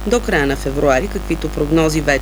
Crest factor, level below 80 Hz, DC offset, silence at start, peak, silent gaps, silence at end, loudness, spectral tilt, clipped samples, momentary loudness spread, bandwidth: 14 dB; -26 dBFS; under 0.1%; 0 s; -2 dBFS; none; 0 s; -17 LUFS; -5 dB/octave; under 0.1%; 7 LU; over 20 kHz